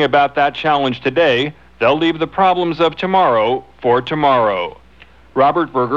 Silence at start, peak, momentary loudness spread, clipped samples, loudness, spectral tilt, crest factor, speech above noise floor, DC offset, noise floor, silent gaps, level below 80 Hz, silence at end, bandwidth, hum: 0 s; -2 dBFS; 5 LU; under 0.1%; -15 LUFS; -6.5 dB/octave; 14 dB; 31 dB; 0.3%; -45 dBFS; none; -50 dBFS; 0 s; 7.4 kHz; none